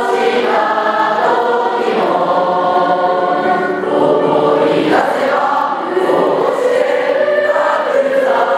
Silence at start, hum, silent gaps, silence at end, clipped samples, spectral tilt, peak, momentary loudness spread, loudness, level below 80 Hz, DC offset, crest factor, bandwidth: 0 s; none; none; 0 s; under 0.1%; -5.5 dB/octave; 0 dBFS; 2 LU; -13 LUFS; -66 dBFS; under 0.1%; 12 dB; 13.5 kHz